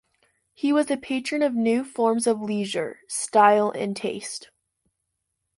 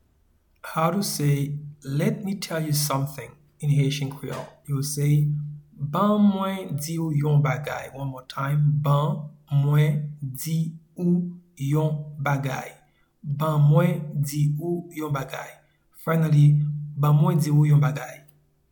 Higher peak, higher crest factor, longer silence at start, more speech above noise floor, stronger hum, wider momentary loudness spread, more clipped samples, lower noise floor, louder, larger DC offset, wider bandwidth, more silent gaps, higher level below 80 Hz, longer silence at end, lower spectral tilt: about the same, -6 dBFS vs -8 dBFS; about the same, 20 dB vs 16 dB; about the same, 0.65 s vs 0.65 s; first, 56 dB vs 41 dB; neither; second, 12 LU vs 15 LU; neither; first, -79 dBFS vs -63 dBFS; about the same, -23 LUFS vs -24 LUFS; neither; second, 11.5 kHz vs 19 kHz; neither; second, -70 dBFS vs -58 dBFS; first, 1.2 s vs 0.55 s; second, -4 dB/octave vs -6.5 dB/octave